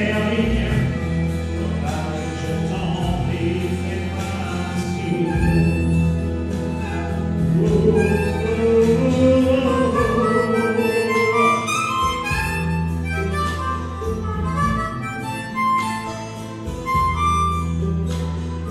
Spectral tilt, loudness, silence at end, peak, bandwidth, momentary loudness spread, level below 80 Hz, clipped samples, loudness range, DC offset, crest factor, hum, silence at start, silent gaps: -6.5 dB/octave; -20 LUFS; 0 s; -4 dBFS; 14 kHz; 9 LU; -32 dBFS; under 0.1%; 6 LU; under 0.1%; 16 dB; none; 0 s; none